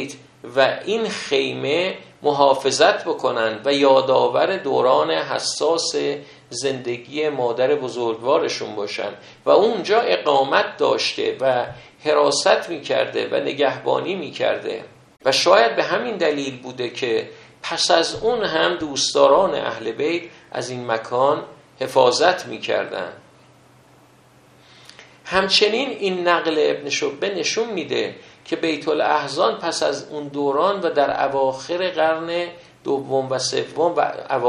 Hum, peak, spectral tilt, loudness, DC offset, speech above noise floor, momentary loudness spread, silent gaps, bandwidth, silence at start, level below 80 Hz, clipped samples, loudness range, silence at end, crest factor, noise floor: none; 0 dBFS; -3 dB/octave; -20 LUFS; under 0.1%; 32 dB; 12 LU; none; 11.5 kHz; 0 s; -62 dBFS; under 0.1%; 4 LU; 0 s; 20 dB; -52 dBFS